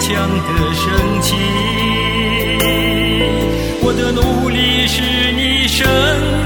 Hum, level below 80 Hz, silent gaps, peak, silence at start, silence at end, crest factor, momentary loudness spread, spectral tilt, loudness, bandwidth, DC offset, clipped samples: none; -24 dBFS; none; 0 dBFS; 0 s; 0 s; 14 dB; 4 LU; -4.5 dB/octave; -14 LUFS; 19 kHz; under 0.1%; under 0.1%